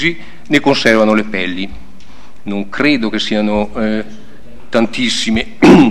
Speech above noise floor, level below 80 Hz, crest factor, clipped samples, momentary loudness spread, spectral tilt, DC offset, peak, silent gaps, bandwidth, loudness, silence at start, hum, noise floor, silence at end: 28 dB; -38 dBFS; 14 dB; 0.4%; 14 LU; -5 dB/octave; 7%; 0 dBFS; none; 13 kHz; -14 LUFS; 0 s; none; -41 dBFS; 0 s